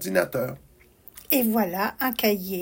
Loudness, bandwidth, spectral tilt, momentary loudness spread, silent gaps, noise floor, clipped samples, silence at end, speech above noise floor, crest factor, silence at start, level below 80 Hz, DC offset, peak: -24 LUFS; 17 kHz; -4.5 dB/octave; 13 LU; none; -51 dBFS; under 0.1%; 0 s; 26 dB; 18 dB; 0 s; -58 dBFS; under 0.1%; -8 dBFS